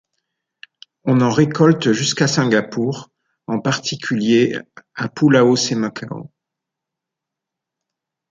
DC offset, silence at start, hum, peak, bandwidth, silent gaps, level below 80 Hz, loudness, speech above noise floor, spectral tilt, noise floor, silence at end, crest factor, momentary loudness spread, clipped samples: under 0.1%; 1.05 s; none; -2 dBFS; 9.4 kHz; none; -60 dBFS; -17 LUFS; 67 dB; -5 dB/octave; -83 dBFS; 2.05 s; 18 dB; 16 LU; under 0.1%